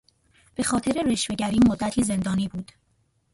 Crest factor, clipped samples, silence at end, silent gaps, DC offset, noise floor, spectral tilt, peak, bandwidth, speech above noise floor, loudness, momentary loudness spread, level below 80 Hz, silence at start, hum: 16 dB; under 0.1%; 0.7 s; none; under 0.1%; -68 dBFS; -5 dB/octave; -10 dBFS; 11.5 kHz; 45 dB; -24 LUFS; 15 LU; -48 dBFS; 0.6 s; none